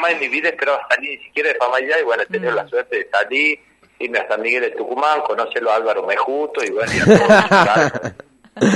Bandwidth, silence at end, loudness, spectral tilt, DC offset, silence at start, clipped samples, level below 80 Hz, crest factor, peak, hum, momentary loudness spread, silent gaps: 11.5 kHz; 0 s; -17 LUFS; -5 dB/octave; under 0.1%; 0 s; under 0.1%; -52 dBFS; 18 dB; 0 dBFS; none; 10 LU; none